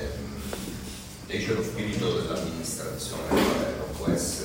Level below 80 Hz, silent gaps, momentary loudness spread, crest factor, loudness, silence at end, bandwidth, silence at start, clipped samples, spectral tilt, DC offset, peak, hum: -44 dBFS; none; 11 LU; 18 dB; -29 LUFS; 0 s; 16.5 kHz; 0 s; under 0.1%; -4.5 dB/octave; under 0.1%; -10 dBFS; none